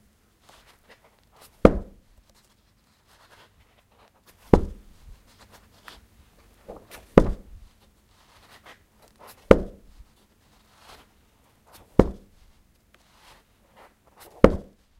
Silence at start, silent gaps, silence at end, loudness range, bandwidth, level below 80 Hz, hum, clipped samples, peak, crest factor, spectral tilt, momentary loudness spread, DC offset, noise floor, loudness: 1.65 s; none; 0.4 s; 5 LU; 16 kHz; -36 dBFS; none; under 0.1%; 0 dBFS; 28 dB; -8 dB/octave; 27 LU; under 0.1%; -63 dBFS; -22 LUFS